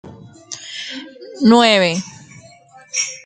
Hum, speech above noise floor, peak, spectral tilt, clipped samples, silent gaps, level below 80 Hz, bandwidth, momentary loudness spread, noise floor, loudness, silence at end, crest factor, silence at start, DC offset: none; 31 dB; 0 dBFS; -3.5 dB/octave; under 0.1%; none; -62 dBFS; 9.4 kHz; 22 LU; -45 dBFS; -15 LUFS; 0.05 s; 18 dB; 0.05 s; under 0.1%